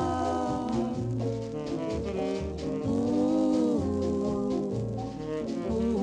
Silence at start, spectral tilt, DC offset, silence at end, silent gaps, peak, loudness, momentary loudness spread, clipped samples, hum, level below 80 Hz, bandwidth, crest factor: 0 s; -7.5 dB/octave; under 0.1%; 0 s; none; -16 dBFS; -30 LUFS; 8 LU; under 0.1%; none; -46 dBFS; 10 kHz; 12 dB